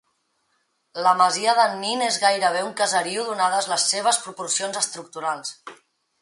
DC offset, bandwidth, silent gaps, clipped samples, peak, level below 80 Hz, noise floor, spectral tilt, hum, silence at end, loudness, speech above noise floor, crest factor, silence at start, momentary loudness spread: under 0.1%; 11.5 kHz; none; under 0.1%; -4 dBFS; -78 dBFS; -70 dBFS; -0.5 dB/octave; none; 0.5 s; -21 LUFS; 48 dB; 20 dB; 0.95 s; 10 LU